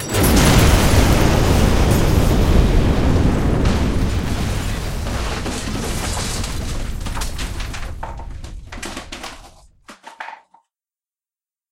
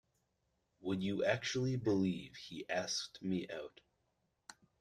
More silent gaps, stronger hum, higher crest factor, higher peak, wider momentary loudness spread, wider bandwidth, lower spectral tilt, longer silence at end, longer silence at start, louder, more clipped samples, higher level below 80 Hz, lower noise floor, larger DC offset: neither; neither; about the same, 18 dB vs 22 dB; first, 0 dBFS vs -18 dBFS; about the same, 18 LU vs 17 LU; first, 17 kHz vs 12.5 kHz; about the same, -5 dB/octave vs -5 dB/octave; first, 1.35 s vs 0.3 s; second, 0 s vs 0.8 s; first, -18 LUFS vs -38 LUFS; neither; first, -22 dBFS vs -72 dBFS; first, under -90 dBFS vs -82 dBFS; neither